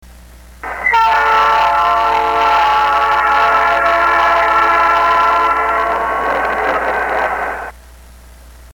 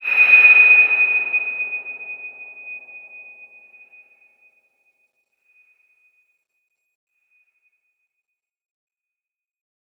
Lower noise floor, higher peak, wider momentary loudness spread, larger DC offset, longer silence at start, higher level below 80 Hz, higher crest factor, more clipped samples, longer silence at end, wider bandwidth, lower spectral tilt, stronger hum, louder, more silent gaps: second, -38 dBFS vs -89 dBFS; about the same, -2 dBFS vs -2 dBFS; second, 7 LU vs 27 LU; first, 0.1% vs under 0.1%; first, 0.35 s vs 0 s; first, -38 dBFS vs -88 dBFS; second, 12 dB vs 20 dB; neither; second, 0.05 s vs 6.8 s; first, 17.5 kHz vs 13 kHz; about the same, -3 dB/octave vs -2 dB/octave; neither; about the same, -12 LUFS vs -11 LUFS; neither